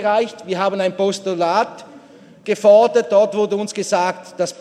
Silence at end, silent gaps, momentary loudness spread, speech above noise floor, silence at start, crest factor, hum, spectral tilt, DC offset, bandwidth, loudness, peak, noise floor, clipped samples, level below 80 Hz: 0.1 s; none; 12 LU; 27 dB; 0 s; 16 dB; none; -4.5 dB/octave; under 0.1%; 12 kHz; -17 LUFS; -2 dBFS; -44 dBFS; under 0.1%; -74 dBFS